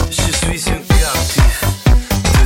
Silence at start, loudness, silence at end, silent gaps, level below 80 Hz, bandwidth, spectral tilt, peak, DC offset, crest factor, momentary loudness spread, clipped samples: 0 s; -15 LUFS; 0 s; none; -16 dBFS; 17 kHz; -4 dB/octave; 0 dBFS; under 0.1%; 12 dB; 3 LU; under 0.1%